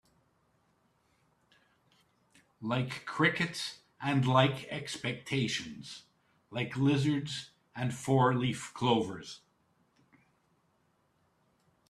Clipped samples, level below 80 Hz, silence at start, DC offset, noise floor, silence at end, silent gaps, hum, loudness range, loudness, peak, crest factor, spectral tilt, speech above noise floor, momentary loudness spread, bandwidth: under 0.1%; -70 dBFS; 2.6 s; under 0.1%; -73 dBFS; 2.55 s; none; none; 5 LU; -32 LUFS; -10 dBFS; 24 dB; -5.5 dB/octave; 42 dB; 17 LU; 12.5 kHz